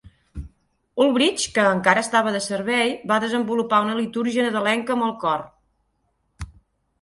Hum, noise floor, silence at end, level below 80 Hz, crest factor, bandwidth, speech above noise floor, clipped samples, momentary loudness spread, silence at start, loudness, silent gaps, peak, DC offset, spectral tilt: none; -70 dBFS; 0.55 s; -48 dBFS; 22 dB; 11.5 kHz; 49 dB; under 0.1%; 22 LU; 0.35 s; -21 LUFS; none; -2 dBFS; under 0.1%; -3.5 dB/octave